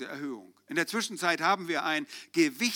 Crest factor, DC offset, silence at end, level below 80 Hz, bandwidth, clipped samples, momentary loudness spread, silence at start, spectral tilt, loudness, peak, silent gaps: 20 dB; under 0.1%; 0 s; -88 dBFS; 19.5 kHz; under 0.1%; 12 LU; 0 s; -3 dB/octave; -29 LUFS; -10 dBFS; none